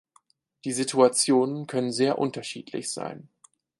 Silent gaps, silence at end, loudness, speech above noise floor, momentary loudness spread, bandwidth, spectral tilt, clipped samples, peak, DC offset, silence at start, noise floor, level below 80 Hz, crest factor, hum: none; 0.55 s; -25 LUFS; 39 dB; 15 LU; 11.5 kHz; -4 dB/octave; under 0.1%; -6 dBFS; under 0.1%; 0.65 s; -64 dBFS; -76 dBFS; 20 dB; none